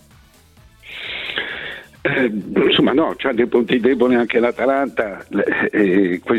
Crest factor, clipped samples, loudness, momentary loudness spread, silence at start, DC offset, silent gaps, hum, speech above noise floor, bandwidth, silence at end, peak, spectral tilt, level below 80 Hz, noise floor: 14 dB; under 0.1%; -18 LUFS; 11 LU; 0.85 s; under 0.1%; none; none; 32 dB; 11 kHz; 0 s; -4 dBFS; -6.5 dB/octave; -52 dBFS; -49 dBFS